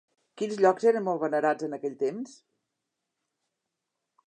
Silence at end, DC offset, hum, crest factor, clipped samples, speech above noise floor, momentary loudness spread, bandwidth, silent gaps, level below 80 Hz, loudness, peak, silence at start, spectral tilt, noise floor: 1.95 s; under 0.1%; none; 20 dB; under 0.1%; 58 dB; 13 LU; 9.6 kHz; none; -86 dBFS; -27 LUFS; -10 dBFS; 0.35 s; -6 dB/octave; -84 dBFS